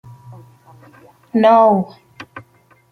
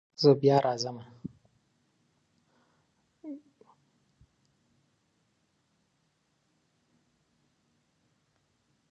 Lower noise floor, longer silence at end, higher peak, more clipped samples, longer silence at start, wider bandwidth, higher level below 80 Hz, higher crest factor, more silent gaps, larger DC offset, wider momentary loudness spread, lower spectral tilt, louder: second, -52 dBFS vs -75 dBFS; second, 0.5 s vs 5.55 s; first, -2 dBFS vs -8 dBFS; neither; about the same, 0.3 s vs 0.2 s; second, 6.4 kHz vs 7.6 kHz; first, -66 dBFS vs -78 dBFS; second, 16 dB vs 26 dB; neither; neither; about the same, 26 LU vs 24 LU; first, -8 dB/octave vs -6.5 dB/octave; first, -13 LUFS vs -26 LUFS